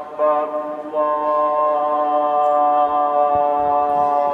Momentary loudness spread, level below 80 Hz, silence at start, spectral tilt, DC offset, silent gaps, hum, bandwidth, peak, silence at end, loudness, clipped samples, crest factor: 5 LU; -58 dBFS; 0 s; -7 dB/octave; under 0.1%; none; none; 4.7 kHz; -8 dBFS; 0 s; -18 LUFS; under 0.1%; 10 dB